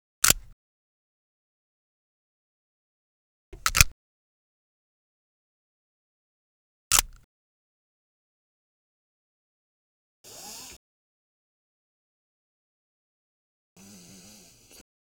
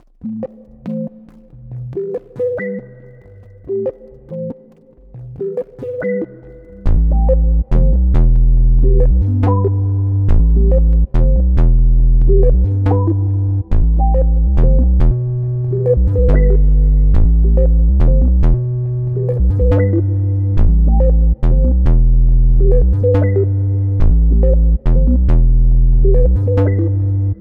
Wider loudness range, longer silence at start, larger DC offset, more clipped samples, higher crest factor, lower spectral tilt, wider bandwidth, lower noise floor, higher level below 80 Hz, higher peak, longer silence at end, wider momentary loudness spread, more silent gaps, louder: first, 19 LU vs 11 LU; about the same, 0.25 s vs 0.25 s; neither; neither; first, 34 dB vs 10 dB; second, -0.5 dB/octave vs -12 dB/octave; first, over 20 kHz vs 2.4 kHz; first, -53 dBFS vs -44 dBFS; second, -44 dBFS vs -12 dBFS; about the same, 0 dBFS vs 0 dBFS; first, 4.45 s vs 0.05 s; first, 22 LU vs 12 LU; first, 0.53-3.52 s, 3.92-6.91 s, 7.24-10.24 s vs none; second, -22 LUFS vs -15 LUFS